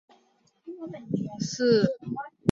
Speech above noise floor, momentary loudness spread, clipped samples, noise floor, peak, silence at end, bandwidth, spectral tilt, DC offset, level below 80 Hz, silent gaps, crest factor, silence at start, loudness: 40 dB; 18 LU; under 0.1%; -66 dBFS; -6 dBFS; 0 s; 7.8 kHz; -6 dB/octave; under 0.1%; -66 dBFS; none; 22 dB; 0.65 s; -27 LUFS